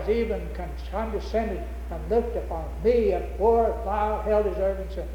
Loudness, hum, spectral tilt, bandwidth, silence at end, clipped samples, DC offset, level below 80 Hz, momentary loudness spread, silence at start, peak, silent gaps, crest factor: -26 LUFS; none; -8 dB/octave; 17.5 kHz; 0 s; under 0.1%; under 0.1%; -34 dBFS; 11 LU; 0 s; -10 dBFS; none; 16 dB